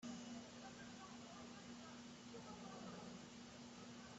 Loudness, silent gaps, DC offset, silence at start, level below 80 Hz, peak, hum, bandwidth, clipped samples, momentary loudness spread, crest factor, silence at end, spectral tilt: -56 LUFS; none; under 0.1%; 0 s; -80 dBFS; -42 dBFS; none; 8.2 kHz; under 0.1%; 3 LU; 14 dB; 0 s; -4 dB/octave